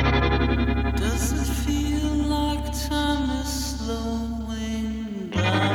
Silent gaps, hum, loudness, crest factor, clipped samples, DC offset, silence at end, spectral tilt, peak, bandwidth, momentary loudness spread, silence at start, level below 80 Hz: none; none; -25 LUFS; 14 dB; under 0.1%; under 0.1%; 0 s; -5 dB/octave; -8 dBFS; 17 kHz; 7 LU; 0 s; -28 dBFS